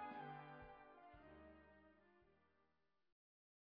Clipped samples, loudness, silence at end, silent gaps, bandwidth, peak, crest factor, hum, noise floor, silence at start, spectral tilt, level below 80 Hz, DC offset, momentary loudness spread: under 0.1%; -60 LUFS; 1.1 s; none; 4.9 kHz; -44 dBFS; 18 dB; none; -87 dBFS; 0 s; -4.5 dB/octave; -78 dBFS; under 0.1%; 12 LU